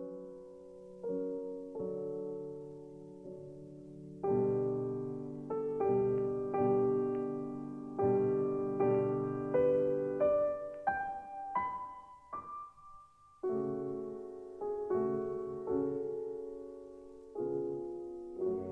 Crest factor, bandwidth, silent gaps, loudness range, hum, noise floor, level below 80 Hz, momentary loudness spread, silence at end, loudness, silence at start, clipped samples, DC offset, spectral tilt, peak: 16 dB; 3.2 kHz; none; 9 LU; none; -59 dBFS; -68 dBFS; 19 LU; 0 s; -36 LUFS; 0 s; under 0.1%; under 0.1%; -10 dB/octave; -20 dBFS